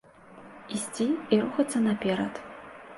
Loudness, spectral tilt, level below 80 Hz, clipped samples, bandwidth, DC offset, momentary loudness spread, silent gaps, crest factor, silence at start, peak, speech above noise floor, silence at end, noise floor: -28 LUFS; -5 dB/octave; -66 dBFS; under 0.1%; 11.5 kHz; under 0.1%; 19 LU; none; 20 dB; 0.3 s; -10 dBFS; 23 dB; 0 s; -50 dBFS